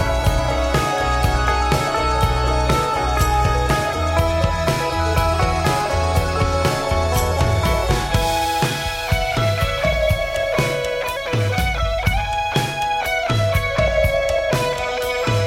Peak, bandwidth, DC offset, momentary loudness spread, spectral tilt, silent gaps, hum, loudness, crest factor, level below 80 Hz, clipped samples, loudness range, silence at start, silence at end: -4 dBFS; 16.5 kHz; under 0.1%; 3 LU; -5 dB/octave; none; none; -19 LUFS; 14 dB; -26 dBFS; under 0.1%; 2 LU; 0 s; 0 s